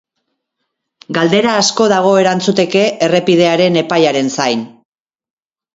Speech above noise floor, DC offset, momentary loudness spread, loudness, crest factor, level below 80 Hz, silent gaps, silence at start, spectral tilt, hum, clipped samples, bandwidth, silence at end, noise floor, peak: 61 dB; under 0.1%; 6 LU; -12 LUFS; 14 dB; -58 dBFS; none; 1.1 s; -4.5 dB/octave; none; under 0.1%; 8 kHz; 1.05 s; -73 dBFS; 0 dBFS